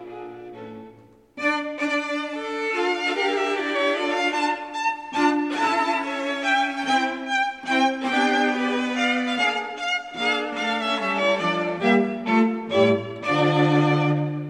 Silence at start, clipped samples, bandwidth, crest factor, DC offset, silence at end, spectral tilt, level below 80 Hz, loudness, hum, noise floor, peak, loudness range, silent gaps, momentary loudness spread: 0 s; under 0.1%; 11.5 kHz; 16 dB; under 0.1%; 0 s; -5 dB/octave; -70 dBFS; -22 LUFS; none; -50 dBFS; -6 dBFS; 3 LU; none; 6 LU